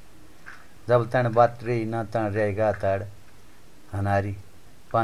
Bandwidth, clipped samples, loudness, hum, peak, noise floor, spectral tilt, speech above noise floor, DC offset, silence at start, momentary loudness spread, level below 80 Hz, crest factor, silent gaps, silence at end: 14 kHz; under 0.1%; -25 LUFS; none; -4 dBFS; -53 dBFS; -8 dB/octave; 29 dB; 0.8%; 0.45 s; 20 LU; -50 dBFS; 20 dB; none; 0 s